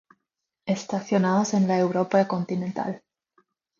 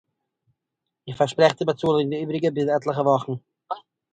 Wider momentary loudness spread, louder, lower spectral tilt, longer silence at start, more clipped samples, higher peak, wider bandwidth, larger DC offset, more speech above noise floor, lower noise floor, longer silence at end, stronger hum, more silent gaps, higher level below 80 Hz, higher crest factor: second, 10 LU vs 16 LU; about the same, -24 LUFS vs -22 LUFS; about the same, -6.5 dB/octave vs -6.5 dB/octave; second, 0.65 s vs 1.05 s; neither; second, -8 dBFS vs -2 dBFS; second, 7.4 kHz vs 9.2 kHz; neither; about the same, 59 dB vs 61 dB; about the same, -82 dBFS vs -83 dBFS; first, 0.8 s vs 0.35 s; neither; neither; second, -70 dBFS vs -64 dBFS; second, 16 dB vs 22 dB